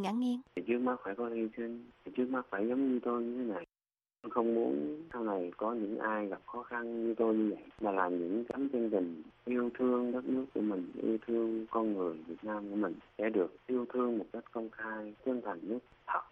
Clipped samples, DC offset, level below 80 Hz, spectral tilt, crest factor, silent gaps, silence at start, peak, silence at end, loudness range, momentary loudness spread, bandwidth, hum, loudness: under 0.1%; under 0.1%; -74 dBFS; -8 dB/octave; 18 dB; none; 0 s; -16 dBFS; 0.05 s; 2 LU; 9 LU; 6.6 kHz; none; -36 LUFS